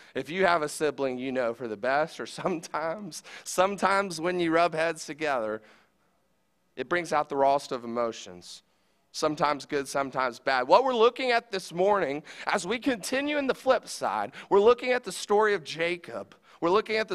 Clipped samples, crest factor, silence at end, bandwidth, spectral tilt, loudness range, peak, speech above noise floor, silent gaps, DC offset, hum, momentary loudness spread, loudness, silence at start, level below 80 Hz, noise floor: under 0.1%; 22 dB; 0 s; 15 kHz; -4 dB/octave; 4 LU; -6 dBFS; 46 dB; none; under 0.1%; none; 12 LU; -27 LUFS; 0.15 s; -66 dBFS; -73 dBFS